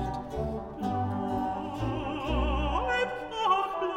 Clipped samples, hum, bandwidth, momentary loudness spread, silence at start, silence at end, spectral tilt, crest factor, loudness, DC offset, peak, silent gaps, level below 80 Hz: under 0.1%; none; 10 kHz; 7 LU; 0 s; 0 s; -6.5 dB/octave; 16 dB; -30 LUFS; under 0.1%; -14 dBFS; none; -38 dBFS